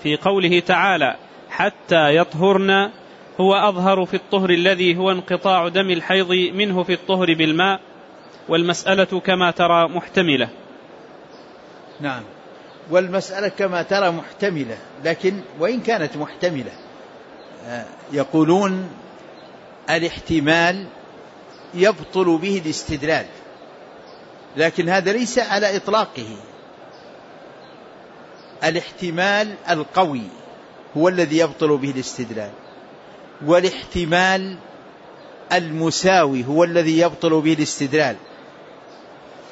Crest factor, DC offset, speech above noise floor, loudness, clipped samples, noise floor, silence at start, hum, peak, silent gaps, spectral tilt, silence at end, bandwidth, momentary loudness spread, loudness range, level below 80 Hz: 18 dB; under 0.1%; 24 dB; -19 LUFS; under 0.1%; -42 dBFS; 0 s; none; -4 dBFS; none; -4.5 dB/octave; 0.05 s; 8 kHz; 14 LU; 7 LU; -54 dBFS